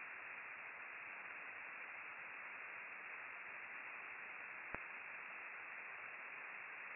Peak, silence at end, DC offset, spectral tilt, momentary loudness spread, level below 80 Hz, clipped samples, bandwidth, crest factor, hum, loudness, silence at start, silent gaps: -24 dBFS; 0 s; under 0.1%; 4 dB/octave; 1 LU; -82 dBFS; under 0.1%; 2.9 kHz; 28 dB; none; -50 LUFS; 0 s; none